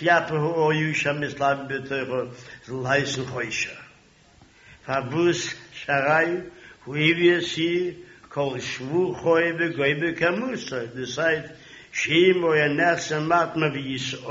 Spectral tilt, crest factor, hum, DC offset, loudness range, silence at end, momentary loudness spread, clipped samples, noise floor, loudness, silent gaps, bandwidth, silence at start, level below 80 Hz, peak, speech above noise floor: -3.5 dB/octave; 18 dB; none; under 0.1%; 5 LU; 0 s; 12 LU; under 0.1%; -55 dBFS; -23 LUFS; none; 7.6 kHz; 0 s; -60 dBFS; -6 dBFS; 31 dB